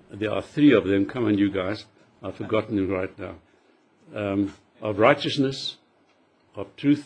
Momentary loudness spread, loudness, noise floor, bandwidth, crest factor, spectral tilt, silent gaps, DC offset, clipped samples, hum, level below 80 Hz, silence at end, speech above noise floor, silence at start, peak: 19 LU; -24 LUFS; -62 dBFS; 9.4 kHz; 22 dB; -6.5 dB/octave; none; under 0.1%; under 0.1%; none; -62 dBFS; 0 s; 39 dB; 0.1 s; -2 dBFS